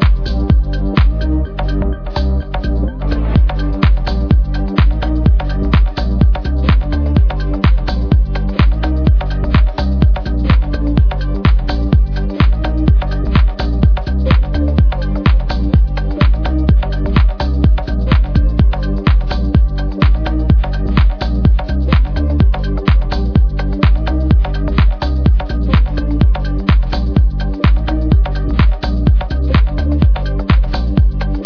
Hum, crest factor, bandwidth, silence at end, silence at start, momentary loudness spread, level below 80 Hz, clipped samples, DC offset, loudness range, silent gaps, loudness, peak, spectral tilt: none; 12 dB; 5.4 kHz; 0 s; 0 s; 3 LU; -14 dBFS; under 0.1%; under 0.1%; 1 LU; none; -15 LUFS; 0 dBFS; -9 dB/octave